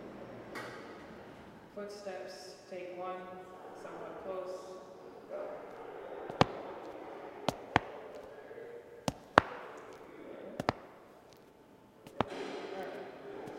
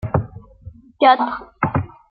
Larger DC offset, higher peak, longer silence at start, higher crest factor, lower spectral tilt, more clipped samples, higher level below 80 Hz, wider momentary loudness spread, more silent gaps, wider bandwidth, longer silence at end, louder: neither; about the same, 0 dBFS vs -2 dBFS; about the same, 0 s vs 0.05 s; first, 40 dB vs 18 dB; second, -5 dB/octave vs -9.5 dB/octave; neither; second, -64 dBFS vs -44 dBFS; first, 20 LU vs 11 LU; neither; first, 16 kHz vs 5.2 kHz; second, 0 s vs 0.25 s; second, -39 LUFS vs -19 LUFS